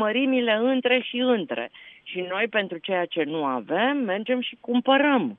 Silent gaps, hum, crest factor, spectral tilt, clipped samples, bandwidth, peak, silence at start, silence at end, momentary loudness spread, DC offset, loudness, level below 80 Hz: none; none; 18 dB; -8 dB/octave; under 0.1%; 4 kHz; -6 dBFS; 0 s; 0.05 s; 11 LU; under 0.1%; -24 LUFS; -78 dBFS